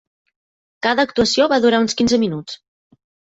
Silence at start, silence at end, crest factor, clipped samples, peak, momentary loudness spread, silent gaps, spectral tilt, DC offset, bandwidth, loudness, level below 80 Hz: 0.85 s; 0.8 s; 16 dB; under 0.1%; -2 dBFS; 15 LU; none; -4 dB/octave; under 0.1%; 8 kHz; -17 LUFS; -50 dBFS